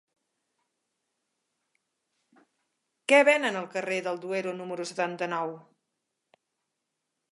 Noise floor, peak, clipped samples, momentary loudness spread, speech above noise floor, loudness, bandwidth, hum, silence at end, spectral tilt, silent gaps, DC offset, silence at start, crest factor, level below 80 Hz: -83 dBFS; -8 dBFS; under 0.1%; 15 LU; 56 dB; -27 LUFS; 11.5 kHz; none; 1.7 s; -4 dB/octave; none; under 0.1%; 3.1 s; 24 dB; -88 dBFS